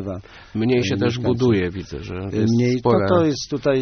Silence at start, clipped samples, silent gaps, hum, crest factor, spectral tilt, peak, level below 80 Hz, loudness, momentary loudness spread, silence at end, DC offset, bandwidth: 0 s; under 0.1%; none; none; 16 dB; -6.5 dB/octave; -4 dBFS; -46 dBFS; -20 LUFS; 13 LU; 0 s; under 0.1%; 6.6 kHz